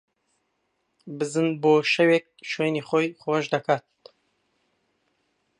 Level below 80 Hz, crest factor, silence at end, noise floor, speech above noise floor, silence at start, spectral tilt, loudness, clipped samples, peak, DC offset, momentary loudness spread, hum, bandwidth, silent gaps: -76 dBFS; 20 dB; 1.8 s; -74 dBFS; 51 dB; 1.05 s; -5.5 dB/octave; -24 LUFS; under 0.1%; -6 dBFS; under 0.1%; 9 LU; none; 11 kHz; none